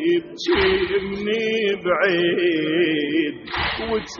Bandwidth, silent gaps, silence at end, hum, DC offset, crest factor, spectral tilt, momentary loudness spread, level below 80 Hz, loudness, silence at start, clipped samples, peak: 6.8 kHz; none; 0 s; none; under 0.1%; 16 dB; -2.5 dB/octave; 6 LU; -44 dBFS; -21 LUFS; 0 s; under 0.1%; -6 dBFS